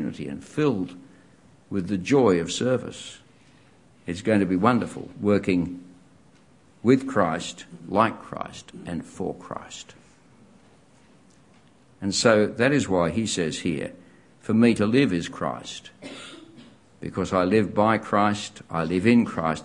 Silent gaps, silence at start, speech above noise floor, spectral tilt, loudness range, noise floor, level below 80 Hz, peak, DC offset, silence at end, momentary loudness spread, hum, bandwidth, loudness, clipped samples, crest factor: none; 0 s; 33 dB; -5.5 dB/octave; 7 LU; -56 dBFS; -60 dBFS; -2 dBFS; under 0.1%; 0 s; 19 LU; none; 11 kHz; -24 LUFS; under 0.1%; 22 dB